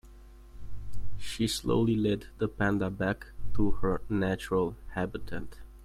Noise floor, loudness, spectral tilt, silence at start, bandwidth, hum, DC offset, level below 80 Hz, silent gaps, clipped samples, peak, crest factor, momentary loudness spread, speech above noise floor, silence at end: -51 dBFS; -31 LUFS; -6 dB/octave; 0.05 s; 15 kHz; none; under 0.1%; -42 dBFS; none; under 0.1%; -14 dBFS; 16 dB; 17 LU; 22 dB; 0 s